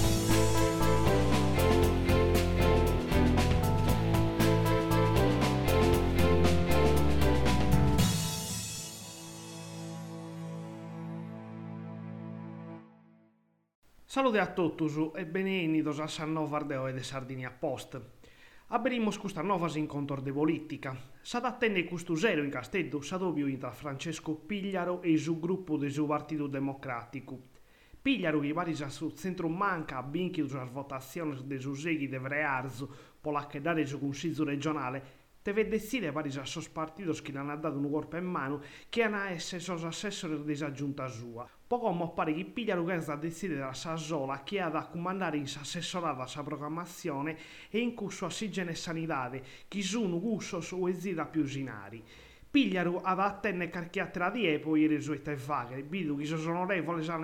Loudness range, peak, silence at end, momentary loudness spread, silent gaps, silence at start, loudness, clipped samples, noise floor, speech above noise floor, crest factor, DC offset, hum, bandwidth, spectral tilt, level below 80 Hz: 9 LU; -14 dBFS; 0 s; 14 LU; 13.75-13.82 s; 0 s; -32 LUFS; under 0.1%; -70 dBFS; 36 dB; 18 dB; under 0.1%; none; 18 kHz; -5.5 dB/octave; -44 dBFS